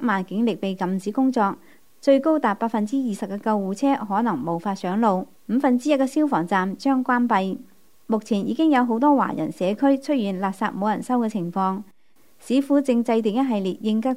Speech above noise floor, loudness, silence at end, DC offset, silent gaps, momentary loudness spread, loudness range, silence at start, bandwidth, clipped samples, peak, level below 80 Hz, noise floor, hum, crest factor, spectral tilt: 40 dB; -22 LUFS; 0 s; 0.3%; none; 7 LU; 2 LU; 0 s; 15.5 kHz; under 0.1%; -6 dBFS; -72 dBFS; -62 dBFS; none; 16 dB; -6.5 dB/octave